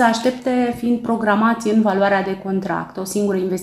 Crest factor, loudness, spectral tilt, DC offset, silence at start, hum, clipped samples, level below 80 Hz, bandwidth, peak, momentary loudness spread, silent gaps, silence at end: 16 dB; -19 LUFS; -5.5 dB/octave; under 0.1%; 0 s; none; under 0.1%; -54 dBFS; 14 kHz; -2 dBFS; 7 LU; none; 0 s